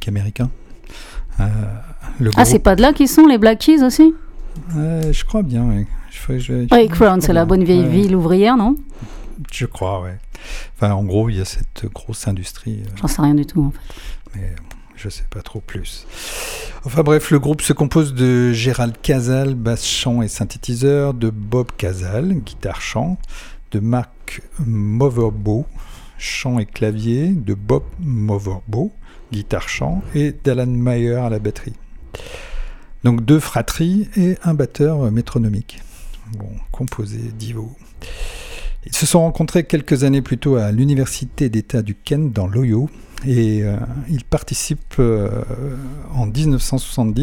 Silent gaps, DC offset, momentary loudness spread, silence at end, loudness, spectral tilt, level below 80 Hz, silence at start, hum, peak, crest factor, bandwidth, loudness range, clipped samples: none; under 0.1%; 19 LU; 0 s; -17 LUFS; -6 dB/octave; -28 dBFS; 0 s; none; 0 dBFS; 16 dB; 18.5 kHz; 9 LU; under 0.1%